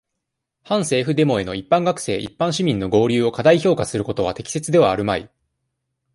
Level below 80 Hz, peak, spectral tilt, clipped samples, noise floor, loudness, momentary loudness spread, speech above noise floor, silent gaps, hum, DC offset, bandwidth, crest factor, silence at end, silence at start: -50 dBFS; -2 dBFS; -5.5 dB/octave; under 0.1%; -79 dBFS; -19 LUFS; 8 LU; 61 dB; none; none; under 0.1%; 11.5 kHz; 18 dB; 0.9 s; 0.7 s